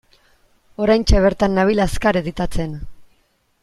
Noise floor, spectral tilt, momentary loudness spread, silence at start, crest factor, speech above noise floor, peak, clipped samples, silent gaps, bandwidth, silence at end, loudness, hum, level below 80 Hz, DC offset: -62 dBFS; -6 dB/octave; 13 LU; 0.8 s; 16 dB; 45 dB; -2 dBFS; under 0.1%; none; 12.5 kHz; 0.6 s; -18 LUFS; none; -28 dBFS; under 0.1%